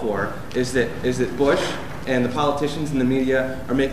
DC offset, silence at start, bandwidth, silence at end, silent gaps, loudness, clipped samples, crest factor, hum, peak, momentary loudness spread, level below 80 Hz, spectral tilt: 2%; 0 s; 15 kHz; 0 s; none; -22 LUFS; under 0.1%; 16 dB; none; -6 dBFS; 6 LU; -42 dBFS; -5.5 dB/octave